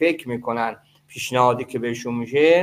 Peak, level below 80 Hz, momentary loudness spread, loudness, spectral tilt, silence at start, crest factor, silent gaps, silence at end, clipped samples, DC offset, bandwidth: -4 dBFS; -64 dBFS; 11 LU; -22 LUFS; -5 dB/octave; 0 s; 18 dB; none; 0 s; under 0.1%; under 0.1%; 16 kHz